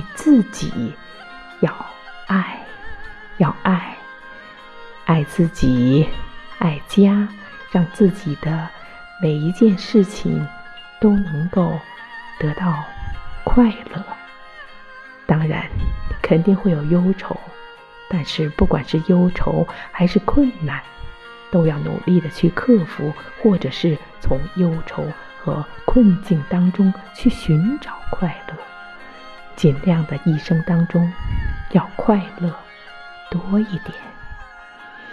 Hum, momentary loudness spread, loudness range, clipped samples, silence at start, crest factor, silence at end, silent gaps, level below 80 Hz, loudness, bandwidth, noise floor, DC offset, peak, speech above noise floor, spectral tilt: none; 22 LU; 4 LU; under 0.1%; 0 s; 18 dB; 0 s; none; -32 dBFS; -19 LUFS; 11 kHz; -40 dBFS; under 0.1%; -2 dBFS; 22 dB; -8 dB/octave